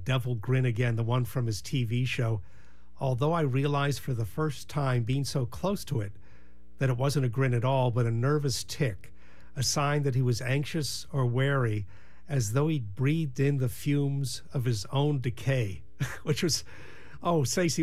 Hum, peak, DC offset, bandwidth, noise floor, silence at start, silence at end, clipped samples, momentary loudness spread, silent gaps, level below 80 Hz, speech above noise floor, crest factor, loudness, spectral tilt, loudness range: none; -14 dBFS; 1%; 15 kHz; -57 dBFS; 0 s; 0 s; under 0.1%; 7 LU; none; -54 dBFS; 28 dB; 16 dB; -29 LUFS; -5.5 dB/octave; 2 LU